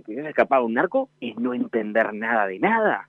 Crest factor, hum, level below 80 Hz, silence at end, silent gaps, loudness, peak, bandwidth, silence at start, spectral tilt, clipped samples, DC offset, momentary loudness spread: 18 dB; none; -72 dBFS; 0.05 s; none; -23 LUFS; -4 dBFS; 4.8 kHz; 0.1 s; -8 dB/octave; under 0.1%; under 0.1%; 7 LU